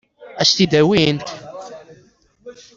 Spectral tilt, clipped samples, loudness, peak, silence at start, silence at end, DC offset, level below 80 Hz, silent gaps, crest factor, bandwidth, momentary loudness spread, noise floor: -4.5 dB/octave; under 0.1%; -15 LUFS; -2 dBFS; 0.2 s; 0.25 s; under 0.1%; -52 dBFS; none; 18 dB; 7.8 kHz; 22 LU; -53 dBFS